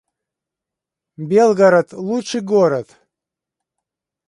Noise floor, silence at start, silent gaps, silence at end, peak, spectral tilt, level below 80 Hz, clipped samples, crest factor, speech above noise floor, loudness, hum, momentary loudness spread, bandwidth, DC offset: -85 dBFS; 1.2 s; none; 1.45 s; -2 dBFS; -6 dB/octave; -68 dBFS; under 0.1%; 18 dB; 70 dB; -16 LUFS; none; 12 LU; 11 kHz; under 0.1%